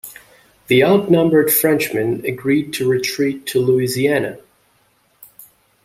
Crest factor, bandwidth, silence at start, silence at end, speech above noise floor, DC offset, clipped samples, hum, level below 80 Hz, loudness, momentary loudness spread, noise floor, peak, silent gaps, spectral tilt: 16 dB; 16.5 kHz; 0.05 s; 1.45 s; 43 dB; under 0.1%; under 0.1%; none; -56 dBFS; -16 LUFS; 8 LU; -59 dBFS; -2 dBFS; none; -5 dB/octave